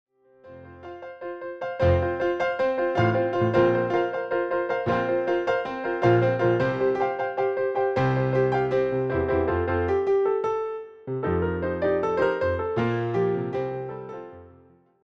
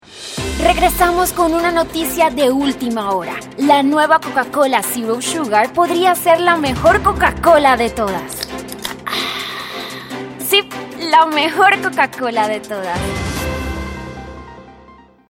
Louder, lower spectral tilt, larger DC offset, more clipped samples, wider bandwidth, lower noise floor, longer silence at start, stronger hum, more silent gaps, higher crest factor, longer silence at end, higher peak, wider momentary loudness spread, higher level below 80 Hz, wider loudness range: second, -24 LUFS vs -15 LUFS; first, -8.5 dB/octave vs -3.5 dB/octave; neither; neither; second, 7 kHz vs 17 kHz; first, -56 dBFS vs -44 dBFS; first, 0.45 s vs 0.1 s; neither; neither; about the same, 16 dB vs 16 dB; about the same, 0.6 s vs 0.6 s; second, -8 dBFS vs 0 dBFS; about the same, 12 LU vs 14 LU; second, -48 dBFS vs -34 dBFS; second, 2 LU vs 5 LU